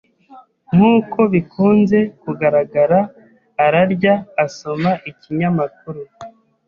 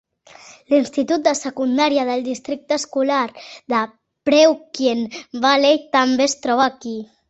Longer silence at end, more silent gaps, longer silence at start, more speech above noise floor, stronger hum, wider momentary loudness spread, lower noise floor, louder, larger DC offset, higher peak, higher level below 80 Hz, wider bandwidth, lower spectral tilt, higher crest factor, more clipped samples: first, 0.4 s vs 0.25 s; neither; second, 0.3 s vs 0.7 s; about the same, 29 dB vs 27 dB; neither; about the same, 13 LU vs 12 LU; about the same, -45 dBFS vs -45 dBFS; about the same, -16 LUFS vs -18 LUFS; neither; about the same, -2 dBFS vs -2 dBFS; first, -54 dBFS vs -64 dBFS; second, 7.2 kHz vs 8.2 kHz; first, -8 dB/octave vs -2.5 dB/octave; about the same, 14 dB vs 18 dB; neither